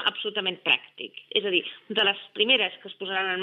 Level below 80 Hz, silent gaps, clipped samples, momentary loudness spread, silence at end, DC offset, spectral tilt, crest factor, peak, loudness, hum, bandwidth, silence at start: under -90 dBFS; none; under 0.1%; 9 LU; 0 s; under 0.1%; -5 dB/octave; 22 dB; -6 dBFS; -25 LUFS; none; 6.2 kHz; 0 s